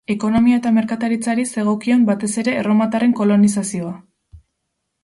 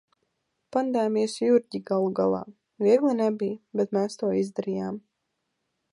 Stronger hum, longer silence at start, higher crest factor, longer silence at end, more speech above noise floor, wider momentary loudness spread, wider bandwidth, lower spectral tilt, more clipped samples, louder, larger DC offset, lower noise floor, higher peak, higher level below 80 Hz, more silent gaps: neither; second, 0.1 s vs 0.7 s; second, 12 dB vs 18 dB; second, 0.65 s vs 0.95 s; first, 58 dB vs 54 dB; about the same, 8 LU vs 10 LU; about the same, 11.5 kHz vs 11.5 kHz; about the same, -6 dB/octave vs -6.5 dB/octave; neither; first, -17 LUFS vs -26 LUFS; neither; second, -75 dBFS vs -79 dBFS; first, -4 dBFS vs -8 dBFS; first, -52 dBFS vs -72 dBFS; neither